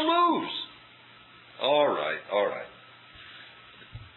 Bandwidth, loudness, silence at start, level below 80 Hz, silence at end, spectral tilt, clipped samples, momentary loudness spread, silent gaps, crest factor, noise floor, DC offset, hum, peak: 4.2 kHz; -27 LUFS; 0 s; -64 dBFS; 0.1 s; -7 dB/octave; under 0.1%; 24 LU; none; 18 dB; -53 dBFS; under 0.1%; none; -10 dBFS